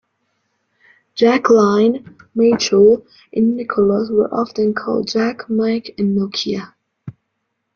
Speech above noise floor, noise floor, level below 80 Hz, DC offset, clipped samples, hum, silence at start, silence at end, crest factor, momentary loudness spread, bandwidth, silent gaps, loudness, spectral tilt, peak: 58 dB; -73 dBFS; -56 dBFS; under 0.1%; under 0.1%; none; 1.15 s; 0.65 s; 16 dB; 10 LU; 7 kHz; none; -16 LUFS; -5.5 dB/octave; -2 dBFS